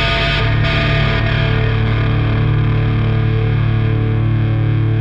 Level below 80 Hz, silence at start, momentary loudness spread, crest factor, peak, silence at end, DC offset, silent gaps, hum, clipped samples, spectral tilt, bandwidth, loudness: -24 dBFS; 0 s; 1 LU; 12 dB; -2 dBFS; 0 s; under 0.1%; none; 50 Hz at -25 dBFS; under 0.1%; -8 dB/octave; 5.8 kHz; -15 LUFS